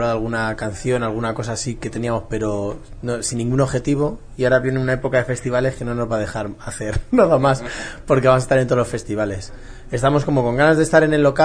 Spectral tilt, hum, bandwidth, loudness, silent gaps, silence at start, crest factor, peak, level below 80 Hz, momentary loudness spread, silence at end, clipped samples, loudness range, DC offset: -6 dB/octave; none; 10.5 kHz; -19 LUFS; none; 0 s; 18 dB; -2 dBFS; -36 dBFS; 11 LU; 0 s; under 0.1%; 5 LU; under 0.1%